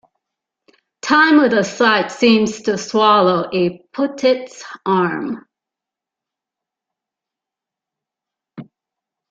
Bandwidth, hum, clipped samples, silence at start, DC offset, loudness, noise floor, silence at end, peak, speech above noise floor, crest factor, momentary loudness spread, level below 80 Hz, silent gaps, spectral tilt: 7.8 kHz; none; under 0.1%; 1.05 s; under 0.1%; -15 LUFS; -86 dBFS; 0.65 s; -2 dBFS; 70 dB; 18 dB; 14 LU; -62 dBFS; none; -4.5 dB/octave